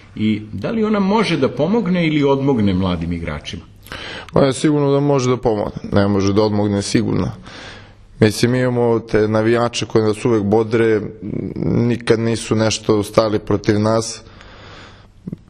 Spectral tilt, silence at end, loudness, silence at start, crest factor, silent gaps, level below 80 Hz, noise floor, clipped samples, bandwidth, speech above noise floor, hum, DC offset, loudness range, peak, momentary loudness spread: -6 dB/octave; 0.15 s; -17 LUFS; 0.15 s; 18 dB; none; -42 dBFS; -41 dBFS; under 0.1%; 13 kHz; 25 dB; none; under 0.1%; 2 LU; 0 dBFS; 11 LU